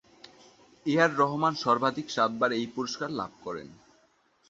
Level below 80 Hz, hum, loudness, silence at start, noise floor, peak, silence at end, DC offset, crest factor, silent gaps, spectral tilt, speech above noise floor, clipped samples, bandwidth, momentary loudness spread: -70 dBFS; none; -28 LUFS; 0.85 s; -66 dBFS; -8 dBFS; 0.75 s; under 0.1%; 22 dB; none; -5 dB/octave; 38 dB; under 0.1%; 8 kHz; 12 LU